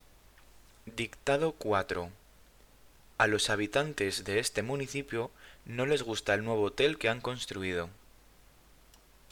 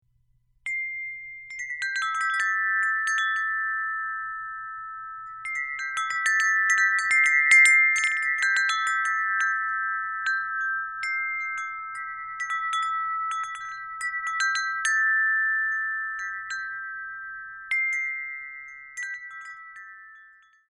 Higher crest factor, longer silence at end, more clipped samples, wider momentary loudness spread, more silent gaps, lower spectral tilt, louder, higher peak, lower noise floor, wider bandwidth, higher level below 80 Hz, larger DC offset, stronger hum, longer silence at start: about the same, 24 dB vs 20 dB; first, 1.4 s vs 0.45 s; neither; second, 12 LU vs 16 LU; neither; first, -4 dB/octave vs 3.5 dB/octave; second, -32 LUFS vs -24 LUFS; second, -10 dBFS vs -6 dBFS; second, -60 dBFS vs -65 dBFS; first, 20 kHz vs 13.5 kHz; first, -58 dBFS vs -70 dBFS; neither; neither; first, 0.85 s vs 0.65 s